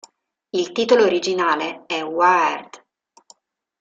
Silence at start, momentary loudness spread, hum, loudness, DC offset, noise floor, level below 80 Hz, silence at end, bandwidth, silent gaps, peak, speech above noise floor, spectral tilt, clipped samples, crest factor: 0.55 s; 10 LU; none; -19 LUFS; under 0.1%; -54 dBFS; -68 dBFS; 1.05 s; 7.8 kHz; none; -2 dBFS; 36 dB; -3.5 dB/octave; under 0.1%; 18 dB